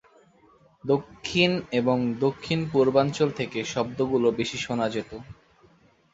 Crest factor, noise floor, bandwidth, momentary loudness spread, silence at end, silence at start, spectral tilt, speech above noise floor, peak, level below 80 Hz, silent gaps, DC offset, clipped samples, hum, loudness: 20 dB; -59 dBFS; 8 kHz; 7 LU; 0.8 s; 0.85 s; -5.5 dB/octave; 34 dB; -6 dBFS; -58 dBFS; none; under 0.1%; under 0.1%; none; -25 LUFS